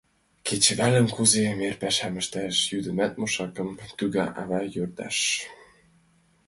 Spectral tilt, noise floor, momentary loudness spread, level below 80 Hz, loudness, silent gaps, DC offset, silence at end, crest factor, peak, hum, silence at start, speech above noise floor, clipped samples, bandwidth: -3 dB/octave; -63 dBFS; 12 LU; -58 dBFS; -25 LUFS; none; under 0.1%; 0.95 s; 22 dB; -4 dBFS; none; 0.45 s; 37 dB; under 0.1%; 12 kHz